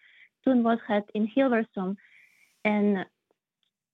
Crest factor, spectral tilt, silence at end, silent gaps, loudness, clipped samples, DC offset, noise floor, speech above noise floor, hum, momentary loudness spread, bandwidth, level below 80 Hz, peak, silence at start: 16 dB; -9 dB/octave; 0.9 s; none; -27 LUFS; under 0.1%; under 0.1%; -80 dBFS; 55 dB; none; 10 LU; 4.4 kHz; -78 dBFS; -12 dBFS; 0.45 s